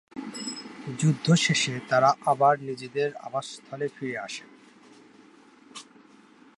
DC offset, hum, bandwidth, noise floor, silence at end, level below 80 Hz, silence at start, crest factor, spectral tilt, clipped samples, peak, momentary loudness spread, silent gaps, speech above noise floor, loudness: under 0.1%; none; 11.5 kHz; -55 dBFS; 0.75 s; -72 dBFS; 0.15 s; 20 dB; -4.5 dB/octave; under 0.1%; -8 dBFS; 17 LU; none; 29 dB; -26 LUFS